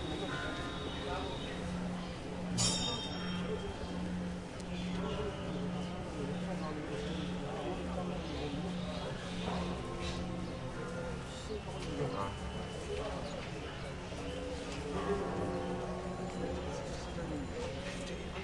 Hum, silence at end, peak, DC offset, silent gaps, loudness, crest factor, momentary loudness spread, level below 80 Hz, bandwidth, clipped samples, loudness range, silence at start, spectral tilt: none; 0 s; -20 dBFS; under 0.1%; none; -39 LUFS; 20 dB; 5 LU; -50 dBFS; 11.5 kHz; under 0.1%; 3 LU; 0 s; -5 dB/octave